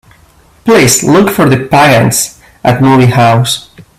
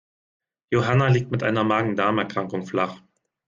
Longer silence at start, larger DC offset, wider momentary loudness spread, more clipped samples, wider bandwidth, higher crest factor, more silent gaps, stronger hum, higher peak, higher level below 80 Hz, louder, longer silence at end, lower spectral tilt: about the same, 0.65 s vs 0.7 s; neither; about the same, 9 LU vs 8 LU; first, 0.2% vs under 0.1%; first, 16 kHz vs 7.4 kHz; second, 8 dB vs 16 dB; neither; neither; first, 0 dBFS vs -8 dBFS; first, -38 dBFS vs -56 dBFS; first, -8 LUFS vs -23 LUFS; second, 0.2 s vs 0.5 s; second, -4.5 dB/octave vs -7 dB/octave